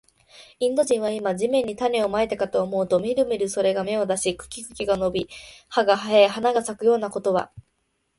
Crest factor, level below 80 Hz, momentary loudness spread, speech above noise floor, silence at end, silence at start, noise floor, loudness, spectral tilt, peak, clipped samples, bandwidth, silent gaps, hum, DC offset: 20 dB; -56 dBFS; 8 LU; 50 dB; 0.6 s; 0.35 s; -72 dBFS; -23 LUFS; -4 dB/octave; -4 dBFS; under 0.1%; 11.5 kHz; none; none; under 0.1%